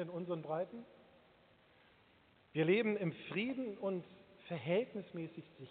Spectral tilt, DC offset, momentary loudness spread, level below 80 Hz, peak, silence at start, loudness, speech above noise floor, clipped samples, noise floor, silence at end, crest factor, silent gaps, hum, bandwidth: -5.5 dB/octave; under 0.1%; 20 LU; -82 dBFS; -20 dBFS; 0 s; -39 LUFS; 30 dB; under 0.1%; -69 dBFS; 0 s; 20 dB; none; none; 4.5 kHz